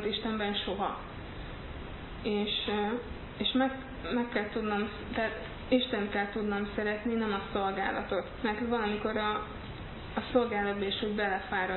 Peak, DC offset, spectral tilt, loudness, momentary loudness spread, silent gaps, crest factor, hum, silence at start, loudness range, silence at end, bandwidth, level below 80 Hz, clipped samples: -14 dBFS; under 0.1%; -9 dB/octave; -32 LUFS; 13 LU; none; 20 dB; none; 0 s; 2 LU; 0 s; 4.3 kHz; -50 dBFS; under 0.1%